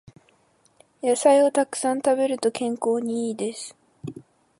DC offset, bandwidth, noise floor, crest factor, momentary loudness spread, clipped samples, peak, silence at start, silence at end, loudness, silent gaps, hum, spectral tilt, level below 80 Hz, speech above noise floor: under 0.1%; 11.5 kHz; -62 dBFS; 18 dB; 21 LU; under 0.1%; -6 dBFS; 1.05 s; 0.4 s; -23 LUFS; none; none; -4 dB/octave; -72 dBFS; 40 dB